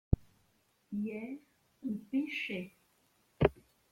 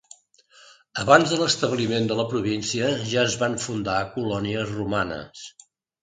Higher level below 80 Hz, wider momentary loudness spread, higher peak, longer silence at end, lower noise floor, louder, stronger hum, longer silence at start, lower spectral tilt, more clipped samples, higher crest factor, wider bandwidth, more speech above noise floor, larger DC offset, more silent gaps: first, -48 dBFS vs -54 dBFS; about the same, 13 LU vs 13 LU; second, -10 dBFS vs 0 dBFS; second, 0.4 s vs 0.55 s; first, -73 dBFS vs -56 dBFS; second, -37 LUFS vs -23 LUFS; neither; second, 0.1 s vs 0.95 s; first, -8 dB/octave vs -4 dB/octave; neither; about the same, 26 dB vs 24 dB; first, 16 kHz vs 9.6 kHz; about the same, 35 dB vs 32 dB; neither; neither